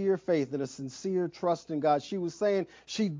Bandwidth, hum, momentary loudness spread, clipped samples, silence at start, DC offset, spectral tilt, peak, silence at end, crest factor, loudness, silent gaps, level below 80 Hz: 7.6 kHz; none; 8 LU; under 0.1%; 0 s; under 0.1%; -6 dB/octave; -14 dBFS; 0 s; 16 dB; -31 LUFS; none; -72 dBFS